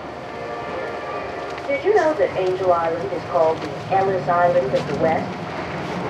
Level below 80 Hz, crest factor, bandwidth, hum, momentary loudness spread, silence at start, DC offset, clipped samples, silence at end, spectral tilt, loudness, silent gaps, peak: -52 dBFS; 16 dB; 10.5 kHz; none; 11 LU; 0 s; under 0.1%; under 0.1%; 0 s; -6.5 dB/octave; -21 LUFS; none; -4 dBFS